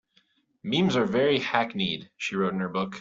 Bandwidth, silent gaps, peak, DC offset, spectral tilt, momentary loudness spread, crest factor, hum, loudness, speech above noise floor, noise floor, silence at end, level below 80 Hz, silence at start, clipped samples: 7.6 kHz; none; -6 dBFS; under 0.1%; -5.5 dB/octave; 8 LU; 22 dB; none; -26 LUFS; 41 dB; -67 dBFS; 0 s; -64 dBFS; 0.65 s; under 0.1%